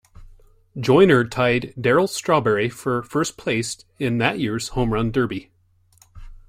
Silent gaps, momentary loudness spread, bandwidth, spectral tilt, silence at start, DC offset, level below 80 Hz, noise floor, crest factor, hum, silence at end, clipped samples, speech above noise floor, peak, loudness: none; 11 LU; 16 kHz; -5.5 dB/octave; 0.2 s; under 0.1%; -44 dBFS; -59 dBFS; 18 dB; none; 0.1 s; under 0.1%; 39 dB; -2 dBFS; -20 LUFS